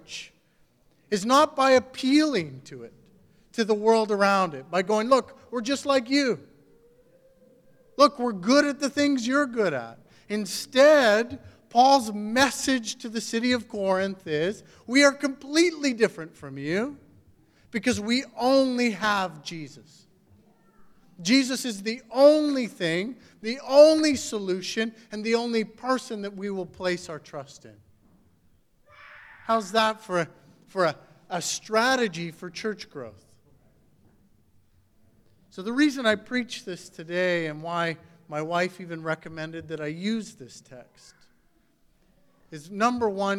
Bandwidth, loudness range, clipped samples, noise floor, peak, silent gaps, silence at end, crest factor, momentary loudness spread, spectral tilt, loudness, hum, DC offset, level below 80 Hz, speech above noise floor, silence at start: 15.5 kHz; 10 LU; under 0.1%; -64 dBFS; -4 dBFS; none; 0 s; 22 dB; 18 LU; -4 dB/octave; -24 LUFS; none; under 0.1%; -66 dBFS; 40 dB; 0.1 s